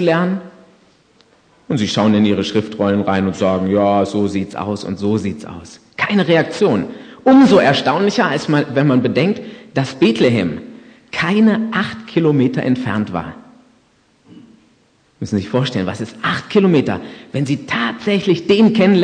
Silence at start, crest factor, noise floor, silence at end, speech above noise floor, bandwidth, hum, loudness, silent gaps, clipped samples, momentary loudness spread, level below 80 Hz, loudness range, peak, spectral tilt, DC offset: 0 s; 16 dB; -56 dBFS; 0 s; 41 dB; 9.4 kHz; none; -16 LUFS; none; under 0.1%; 11 LU; -54 dBFS; 7 LU; 0 dBFS; -6.5 dB/octave; under 0.1%